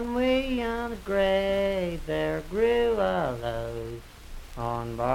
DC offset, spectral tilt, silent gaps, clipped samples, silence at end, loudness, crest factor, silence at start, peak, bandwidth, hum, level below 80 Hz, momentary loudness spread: under 0.1%; -6 dB/octave; none; under 0.1%; 0 s; -27 LUFS; 16 dB; 0 s; -12 dBFS; 16.5 kHz; none; -42 dBFS; 14 LU